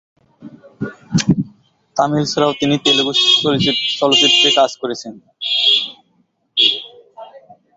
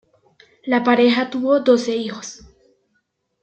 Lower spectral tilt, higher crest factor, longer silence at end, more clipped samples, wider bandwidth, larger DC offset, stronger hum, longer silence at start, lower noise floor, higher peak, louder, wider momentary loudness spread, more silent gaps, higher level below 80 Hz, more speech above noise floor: about the same, -3.5 dB/octave vs -4 dB/octave; about the same, 16 dB vs 18 dB; second, 0.25 s vs 1.05 s; neither; about the same, 8.2 kHz vs 8.4 kHz; neither; neither; second, 0.4 s vs 0.65 s; second, -61 dBFS vs -70 dBFS; about the same, -2 dBFS vs -2 dBFS; first, -14 LUFS vs -18 LUFS; about the same, 17 LU vs 18 LU; neither; first, -52 dBFS vs -60 dBFS; second, 46 dB vs 53 dB